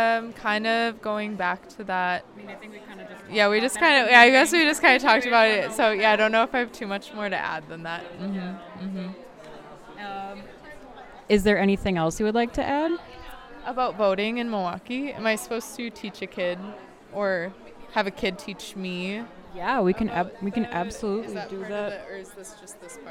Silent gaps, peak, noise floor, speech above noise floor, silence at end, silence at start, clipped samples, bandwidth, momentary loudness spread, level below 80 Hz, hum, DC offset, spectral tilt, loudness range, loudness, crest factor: none; -2 dBFS; -44 dBFS; 20 dB; 0 s; 0 s; under 0.1%; 16.5 kHz; 23 LU; -52 dBFS; none; under 0.1%; -4 dB/octave; 13 LU; -23 LUFS; 24 dB